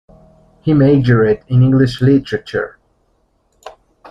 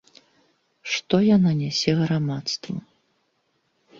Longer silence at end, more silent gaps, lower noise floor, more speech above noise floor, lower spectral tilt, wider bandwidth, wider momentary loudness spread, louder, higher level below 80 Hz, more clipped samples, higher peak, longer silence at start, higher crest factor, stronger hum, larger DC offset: second, 0.4 s vs 1.2 s; neither; second, -60 dBFS vs -70 dBFS; about the same, 48 dB vs 49 dB; first, -9 dB/octave vs -6 dB/octave; about the same, 7.4 kHz vs 7.6 kHz; second, 11 LU vs 15 LU; first, -13 LUFS vs -22 LUFS; first, -42 dBFS vs -60 dBFS; neither; first, -2 dBFS vs -6 dBFS; second, 0.65 s vs 0.85 s; second, 14 dB vs 20 dB; neither; neither